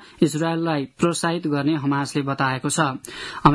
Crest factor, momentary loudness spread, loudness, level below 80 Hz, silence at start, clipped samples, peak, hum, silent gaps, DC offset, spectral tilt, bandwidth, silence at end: 22 dB; 4 LU; -22 LUFS; -52 dBFS; 0 s; under 0.1%; 0 dBFS; none; none; under 0.1%; -5 dB/octave; 12 kHz; 0 s